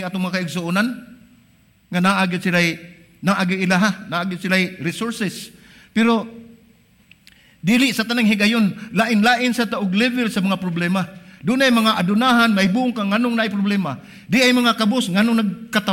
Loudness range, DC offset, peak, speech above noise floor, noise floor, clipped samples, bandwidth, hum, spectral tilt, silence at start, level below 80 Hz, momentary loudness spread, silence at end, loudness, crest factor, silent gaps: 5 LU; under 0.1%; -2 dBFS; 36 dB; -55 dBFS; under 0.1%; 16.5 kHz; none; -5 dB/octave; 0 s; -60 dBFS; 10 LU; 0 s; -18 LUFS; 18 dB; none